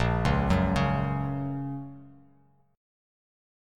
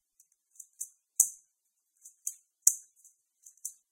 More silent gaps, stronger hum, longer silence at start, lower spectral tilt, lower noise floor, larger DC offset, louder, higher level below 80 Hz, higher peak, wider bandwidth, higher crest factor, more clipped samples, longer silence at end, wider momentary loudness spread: neither; neither; second, 0 s vs 0.8 s; first, -7.5 dB/octave vs 3 dB/octave; second, -63 dBFS vs -80 dBFS; neither; about the same, -28 LUFS vs -29 LUFS; first, -38 dBFS vs under -90 dBFS; second, -12 dBFS vs 0 dBFS; second, 10.5 kHz vs 16.5 kHz; second, 18 dB vs 36 dB; neither; first, 1.65 s vs 0.2 s; second, 13 LU vs 17 LU